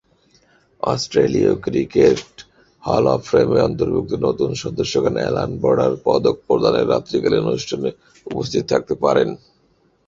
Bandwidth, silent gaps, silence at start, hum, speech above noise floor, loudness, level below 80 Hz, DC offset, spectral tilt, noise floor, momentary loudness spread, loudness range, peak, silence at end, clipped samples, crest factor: 7.8 kHz; none; 0.85 s; none; 42 dB; -18 LUFS; -46 dBFS; under 0.1%; -6 dB/octave; -60 dBFS; 8 LU; 2 LU; 0 dBFS; 0.7 s; under 0.1%; 18 dB